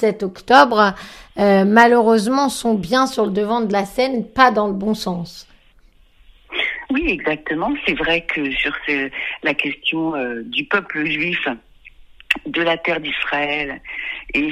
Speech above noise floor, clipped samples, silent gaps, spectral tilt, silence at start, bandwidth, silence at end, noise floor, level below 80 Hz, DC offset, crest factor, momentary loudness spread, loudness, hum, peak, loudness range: 33 dB; under 0.1%; none; -4.5 dB/octave; 0 s; 14.5 kHz; 0 s; -51 dBFS; -46 dBFS; under 0.1%; 18 dB; 12 LU; -18 LUFS; none; 0 dBFS; 6 LU